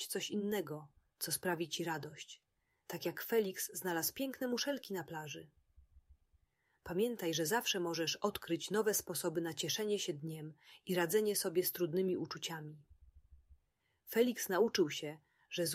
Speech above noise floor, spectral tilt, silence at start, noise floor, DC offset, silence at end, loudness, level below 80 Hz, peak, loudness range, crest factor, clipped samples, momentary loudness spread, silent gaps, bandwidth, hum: 42 dB; -3.5 dB/octave; 0 s; -80 dBFS; under 0.1%; 0 s; -37 LUFS; -74 dBFS; -20 dBFS; 4 LU; 20 dB; under 0.1%; 15 LU; none; 16 kHz; none